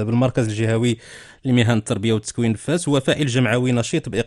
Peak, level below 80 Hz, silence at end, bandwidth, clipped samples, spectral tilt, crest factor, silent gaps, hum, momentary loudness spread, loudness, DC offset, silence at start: -4 dBFS; -48 dBFS; 0 s; 12 kHz; under 0.1%; -6 dB/octave; 14 dB; none; none; 4 LU; -20 LUFS; under 0.1%; 0 s